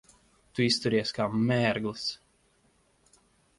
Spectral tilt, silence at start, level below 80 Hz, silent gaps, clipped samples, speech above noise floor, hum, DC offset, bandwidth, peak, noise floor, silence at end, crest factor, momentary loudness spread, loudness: -5 dB/octave; 0.55 s; -64 dBFS; none; under 0.1%; 40 dB; none; under 0.1%; 11.5 kHz; -12 dBFS; -67 dBFS; 1.45 s; 18 dB; 10 LU; -28 LUFS